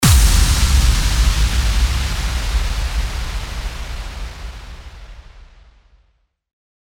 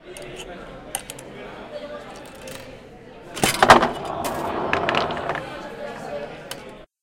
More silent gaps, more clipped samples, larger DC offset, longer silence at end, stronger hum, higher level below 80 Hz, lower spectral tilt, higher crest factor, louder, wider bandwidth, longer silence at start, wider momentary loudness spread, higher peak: neither; neither; neither; first, 1.45 s vs 0.2 s; neither; first, -18 dBFS vs -48 dBFS; about the same, -3.5 dB/octave vs -3 dB/octave; second, 16 dB vs 24 dB; first, -18 LUFS vs -22 LUFS; about the same, 18.5 kHz vs 17 kHz; about the same, 0 s vs 0 s; about the same, 20 LU vs 22 LU; about the same, -2 dBFS vs 0 dBFS